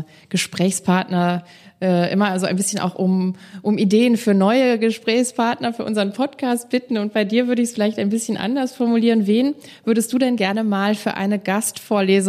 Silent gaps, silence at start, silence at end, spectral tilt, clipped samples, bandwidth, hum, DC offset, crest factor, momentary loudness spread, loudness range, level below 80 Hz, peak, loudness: none; 0 s; 0 s; -5 dB/octave; under 0.1%; 14.5 kHz; none; under 0.1%; 16 dB; 7 LU; 2 LU; -70 dBFS; -4 dBFS; -19 LUFS